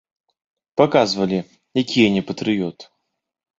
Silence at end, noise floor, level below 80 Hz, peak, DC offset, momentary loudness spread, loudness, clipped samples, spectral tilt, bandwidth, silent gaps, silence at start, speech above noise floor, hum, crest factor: 0.75 s; -76 dBFS; -58 dBFS; -2 dBFS; under 0.1%; 10 LU; -20 LUFS; under 0.1%; -5.5 dB/octave; 7.8 kHz; none; 0.75 s; 57 dB; none; 20 dB